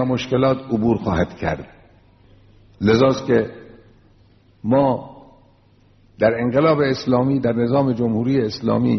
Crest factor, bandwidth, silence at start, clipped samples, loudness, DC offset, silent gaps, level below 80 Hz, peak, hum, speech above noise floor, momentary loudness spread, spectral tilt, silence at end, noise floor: 18 dB; 6.2 kHz; 0 s; under 0.1%; -19 LUFS; under 0.1%; none; -46 dBFS; -2 dBFS; none; 36 dB; 7 LU; -6.5 dB/octave; 0 s; -54 dBFS